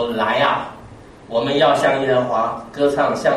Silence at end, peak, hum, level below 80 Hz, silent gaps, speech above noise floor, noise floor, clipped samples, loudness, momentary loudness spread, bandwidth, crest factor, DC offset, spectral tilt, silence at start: 0 s; -4 dBFS; none; -52 dBFS; none; 23 dB; -40 dBFS; under 0.1%; -18 LUFS; 9 LU; 13 kHz; 16 dB; under 0.1%; -5 dB/octave; 0 s